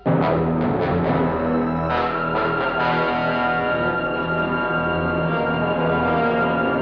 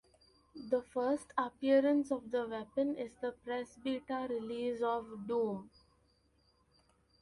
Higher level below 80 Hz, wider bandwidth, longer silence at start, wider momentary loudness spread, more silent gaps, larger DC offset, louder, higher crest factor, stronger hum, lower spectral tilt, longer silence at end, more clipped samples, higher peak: first, -42 dBFS vs -72 dBFS; second, 5.4 kHz vs 11.5 kHz; second, 0.05 s vs 0.55 s; second, 2 LU vs 11 LU; neither; neither; first, -21 LUFS vs -36 LUFS; about the same, 14 dB vs 18 dB; neither; first, -9 dB/octave vs -6 dB/octave; second, 0 s vs 1.55 s; neither; first, -8 dBFS vs -18 dBFS